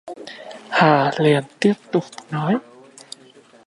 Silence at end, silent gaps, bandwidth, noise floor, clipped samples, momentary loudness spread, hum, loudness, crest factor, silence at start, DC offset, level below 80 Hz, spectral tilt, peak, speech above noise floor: 1.05 s; none; 11.5 kHz; -49 dBFS; under 0.1%; 23 LU; none; -19 LUFS; 20 dB; 0.05 s; under 0.1%; -68 dBFS; -6.5 dB/octave; -2 dBFS; 31 dB